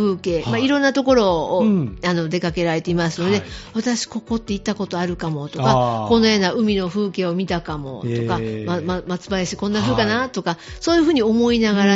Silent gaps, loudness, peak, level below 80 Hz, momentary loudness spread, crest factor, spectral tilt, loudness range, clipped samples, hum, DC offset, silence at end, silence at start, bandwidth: none; -20 LUFS; -2 dBFS; -42 dBFS; 9 LU; 16 dB; -4.5 dB/octave; 4 LU; under 0.1%; none; under 0.1%; 0 s; 0 s; 8 kHz